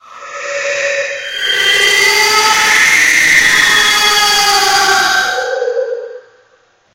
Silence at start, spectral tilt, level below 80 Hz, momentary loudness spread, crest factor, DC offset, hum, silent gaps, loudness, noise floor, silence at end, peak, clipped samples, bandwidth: 0.1 s; 1 dB/octave; -46 dBFS; 12 LU; 12 dB; under 0.1%; none; none; -9 LUFS; -52 dBFS; 0.75 s; 0 dBFS; under 0.1%; 17.5 kHz